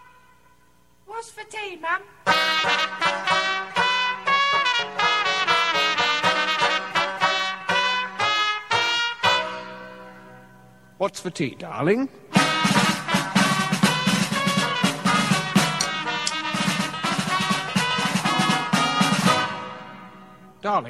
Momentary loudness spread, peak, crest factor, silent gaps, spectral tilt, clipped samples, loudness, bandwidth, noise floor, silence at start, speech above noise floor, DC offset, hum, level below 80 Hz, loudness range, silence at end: 10 LU; -4 dBFS; 20 dB; none; -3.5 dB/octave; under 0.1%; -21 LUFS; 14 kHz; -59 dBFS; 1.1 s; 34 dB; 0.1%; 60 Hz at -50 dBFS; -62 dBFS; 4 LU; 0 s